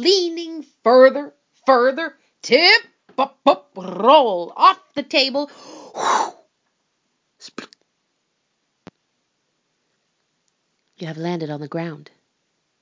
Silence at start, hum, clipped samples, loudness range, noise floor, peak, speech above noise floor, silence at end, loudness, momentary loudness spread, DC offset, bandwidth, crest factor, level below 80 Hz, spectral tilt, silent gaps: 0 s; none; under 0.1%; 16 LU; -72 dBFS; 0 dBFS; 54 dB; 0.85 s; -17 LUFS; 22 LU; under 0.1%; 7.6 kHz; 20 dB; -78 dBFS; -3.5 dB/octave; none